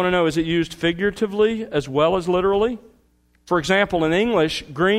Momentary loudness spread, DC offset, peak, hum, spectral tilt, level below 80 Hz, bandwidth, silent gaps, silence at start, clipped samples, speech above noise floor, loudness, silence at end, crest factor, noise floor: 5 LU; under 0.1%; -6 dBFS; none; -5.5 dB/octave; -46 dBFS; 15 kHz; none; 0 s; under 0.1%; 41 dB; -20 LUFS; 0 s; 14 dB; -60 dBFS